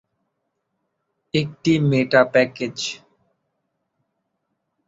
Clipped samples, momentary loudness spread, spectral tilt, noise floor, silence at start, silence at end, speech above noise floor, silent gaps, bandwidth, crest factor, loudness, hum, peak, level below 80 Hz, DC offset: under 0.1%; 12 LU; -5.5 dB/octave; -75 dBFS; 1.35 s; 1.9 s; 57 dB; none; 8 kHz; 22 dB; -20 LUFS; none; -2 dBFS; -60 dBFS; under 0.1%